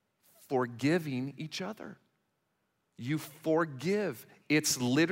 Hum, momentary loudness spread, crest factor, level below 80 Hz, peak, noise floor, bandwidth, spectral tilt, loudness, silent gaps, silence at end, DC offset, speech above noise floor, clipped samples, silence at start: none; 14 LU; 18 dB; -78 dBFS; -16 dBFS; -79 dBFS; 16 kHz; -4.5 dB/octave; -32 LUFS; none; 0 s; under 0.1%; 47 dB; under 0.1%; 0.5 s